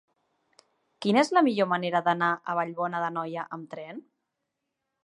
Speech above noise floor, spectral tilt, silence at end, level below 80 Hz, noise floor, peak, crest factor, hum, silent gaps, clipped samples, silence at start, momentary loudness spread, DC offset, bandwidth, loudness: 56 dB; -5.5 dB/octave; 1.05 s; -82 dBFS; -83 dBFS; -8 dBFS; 20 dB; none; none; under 0.1%; 1 s; 17 LU; under 0.1%; 11.5 kHz; -26 LUFS